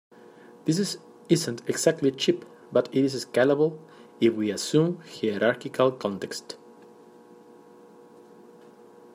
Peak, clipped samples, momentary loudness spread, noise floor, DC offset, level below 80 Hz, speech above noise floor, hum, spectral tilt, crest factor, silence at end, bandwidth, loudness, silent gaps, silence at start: -6 dBFS; under 0.1%; 11 LU; -51 dBFS; under 0.1%; -72 dBFS; 26 dB; none; -5 dB/octave; 22 dB; 2.6 s; 15.5 kHz; -26 LUFS; none; 0.5 s